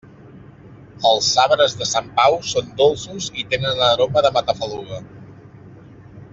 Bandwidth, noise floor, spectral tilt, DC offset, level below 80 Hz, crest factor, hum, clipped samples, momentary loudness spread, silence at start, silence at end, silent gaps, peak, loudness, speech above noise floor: 8 kHz; -42 dBFS; -2.5 dB/octave; under 0.1%; -52 dBFS; 18 dB; none; under 0.1%; 12 LU; 0.25 s; 0.05 s; none; -2 dBFS; -18 LUFS; 24 dB